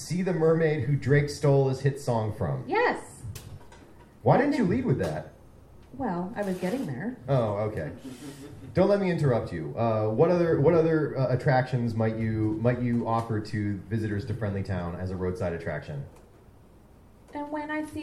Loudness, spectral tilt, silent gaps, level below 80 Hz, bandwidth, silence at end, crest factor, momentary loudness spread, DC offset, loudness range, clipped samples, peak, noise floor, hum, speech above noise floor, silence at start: -27 LUFS; -8 dB/octave; none; -54 dBFS; 13 kHz; 0 s; 20 dB; 15 LU; under 0.1%; 7 LU; under 0.1%; -6 dBFS; -53 dBFS; none; 27 dB; 0 s